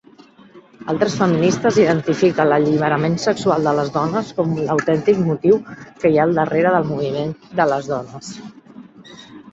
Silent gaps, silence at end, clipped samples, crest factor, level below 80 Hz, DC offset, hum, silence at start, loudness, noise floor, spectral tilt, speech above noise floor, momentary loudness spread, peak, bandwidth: none; 0 s; under 0.1%; 16 dB; -56 dBFS; under 0.1%; none; 0.55 s; -18 LUFS; -46 dBFS; -6.5 dB/octave; 29 dB; 10 LU; -2 dBFS; 8 kHz